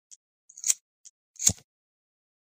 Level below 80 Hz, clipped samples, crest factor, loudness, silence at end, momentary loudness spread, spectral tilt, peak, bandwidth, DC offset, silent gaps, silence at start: -60 dBFS; under 0.1%; 32 dB; -26 LUFS; 1 s; 8 LU; -0.5 dB/octave; -2 dBFS; 15.5 kHz; under 0.1%; 0.81-1.04 s, 1.10-1.34 s; 0.55 s